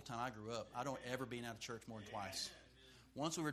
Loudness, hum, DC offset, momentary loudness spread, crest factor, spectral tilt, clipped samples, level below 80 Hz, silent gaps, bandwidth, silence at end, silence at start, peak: -47 LUFS; none; under 0.1%; 12 LU; 22 dB; -4 dB/octave; under 0.1%; -72 dBFS; none; 15 kHz; 0 s; 0 s; -26 dBFS